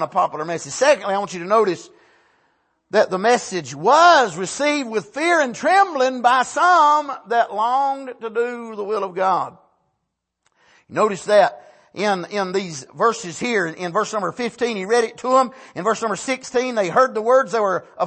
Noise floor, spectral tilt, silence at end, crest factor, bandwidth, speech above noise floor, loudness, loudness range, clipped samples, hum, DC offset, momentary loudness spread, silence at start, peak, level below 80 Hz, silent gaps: -77 dBFS; -3.5 dB/octave; 0 s; 16 dB; 8.8 kHz; 58 dB; -19 LUFS; 6 LU; under 0.1%; none; under 0.1%; 10 LU; 0 s; -2 dBFS; -70 dBFS; none